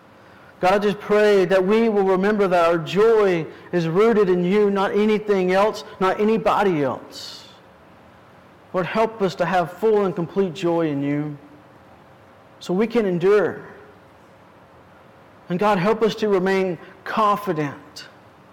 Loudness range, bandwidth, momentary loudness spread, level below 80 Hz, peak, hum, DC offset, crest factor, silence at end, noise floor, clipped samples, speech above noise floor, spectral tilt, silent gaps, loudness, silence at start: 6 LU; 15.5 kHz; 12 LU; -56 dBFS; -12 dBFS; none; under 0.1%; 10 dB; 0.45 s; -49 dBFS; under 0.1%; 29 dB; -6.5 dB/octave; none; -20 LUFS; 0.6 s